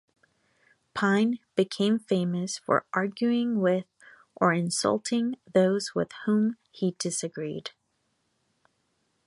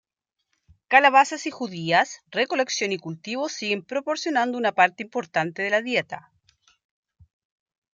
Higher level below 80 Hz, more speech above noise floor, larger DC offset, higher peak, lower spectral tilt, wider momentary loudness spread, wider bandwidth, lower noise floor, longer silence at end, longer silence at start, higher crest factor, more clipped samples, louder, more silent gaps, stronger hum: about the same, -72 dBFS vs -74 dBFS; second, 48 dB vs 58 dB; neither; second, -6 dBFS vs -2 dBFS; first, -5 dB/octave vs -3.5 dB/octave; second, 7 LU vs 13 LU; first, 11.5 kHz vs 9.2 kHz; second, -75 dBFS vs -82 dBFS; second, 1.55 s vs 1.75 s; about the same, 0.95 s vs 0.9 s; about the same, 22 dB vs 22 dB; neither; second, -27 LUFS vs -23 LUFS; neither; neither